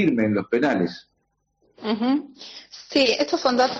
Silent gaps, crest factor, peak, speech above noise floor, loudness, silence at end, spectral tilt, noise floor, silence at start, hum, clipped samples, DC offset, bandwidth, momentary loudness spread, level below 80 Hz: none; 16 dB; -8 dBFS; 50 dB; -22 LUFS; 0 s; -3 dB/octave; -72 dBFS; 0 s; none; under 0.1%; under 0.1%; 8 kHz; 19 LU; -62 dBFS